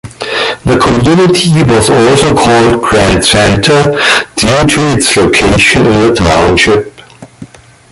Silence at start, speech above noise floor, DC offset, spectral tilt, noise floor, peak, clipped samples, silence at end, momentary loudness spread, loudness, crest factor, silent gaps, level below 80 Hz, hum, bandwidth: 0.05 s; 26 dB; under 0.1%; -4.5 dB/octave; -33 dBFS; 0 dBFS; under 0.1%; 0.45 s; 4 LU; -7 LUFS; 8 dB; none; -26 dBFS; none; 12 kHz